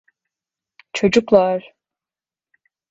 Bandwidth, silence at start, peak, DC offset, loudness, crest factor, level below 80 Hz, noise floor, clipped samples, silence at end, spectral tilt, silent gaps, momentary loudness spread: 8 kHz; 0.95 s; 0 dBFS; under 0.1%; -17 LUFS; 20 dB; -56 dBFS; under -90 dBFS; under 0.1%; 1.3 s; -5.5 dB/octave; none; 13 LU